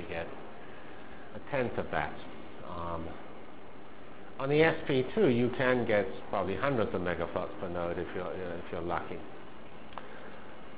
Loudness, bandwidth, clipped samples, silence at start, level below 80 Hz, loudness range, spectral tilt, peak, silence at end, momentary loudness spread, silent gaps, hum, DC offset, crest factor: -32 LUFS; 4 kHz; under 0.1%; 0 s; -56 dBFS; 9 LU; -5 dB/octave; -12 dBFS; 0 s; 21 LU; none; none; 1%; 22 dB